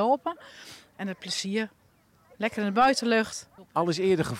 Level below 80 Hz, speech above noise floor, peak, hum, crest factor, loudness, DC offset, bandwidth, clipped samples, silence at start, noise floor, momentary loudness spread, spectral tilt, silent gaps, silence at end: -64 dBFS; 35 dB; -10 dBFS; none; 18 dB; -27 LUFS; under 0.1%; 16 kHz; under 0.1%; 0 s; -62 dBFS; 19 LU; -4.5 dB/octave; none; 0 s